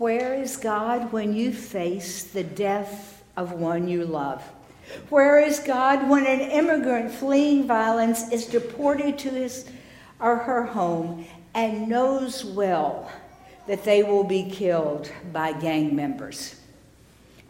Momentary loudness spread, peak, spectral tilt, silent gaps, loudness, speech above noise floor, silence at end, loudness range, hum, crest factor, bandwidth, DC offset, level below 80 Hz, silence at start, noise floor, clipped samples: 14 LU; -6 dBFS; -5 dB/octave; none; -24 LUFS; 30 dB; 0.95 s; 7 LU; none; 18 dB; 16.5 kHz; under 0.1%; -60 dBFS; 0 s; -53 dBFS; under 0.1%